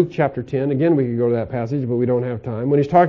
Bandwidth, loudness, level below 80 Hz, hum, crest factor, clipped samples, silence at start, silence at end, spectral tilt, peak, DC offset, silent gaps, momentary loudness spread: 7.2 kHz; -20 LUFS; -50 dBFS; none; 16 dB; under 0.1%; 0 s; 0 s; -10 dB/octave; -2 dBFS; under 0.1%; none; 6 LU